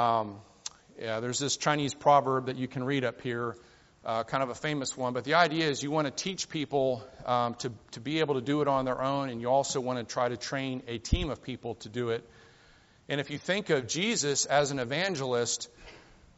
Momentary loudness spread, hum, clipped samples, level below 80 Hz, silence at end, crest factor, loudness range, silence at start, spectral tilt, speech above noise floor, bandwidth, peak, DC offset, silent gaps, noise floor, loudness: 12 LU; none; under 0.1%; -48 dBFS; 0.35 s; 22 dB; 4 LU; 0 s; -3.5 dB/octave; 30 dB; 8 kHz; -8 dBFS; under 0.1%; none; -60 dBFS; -30 LUFS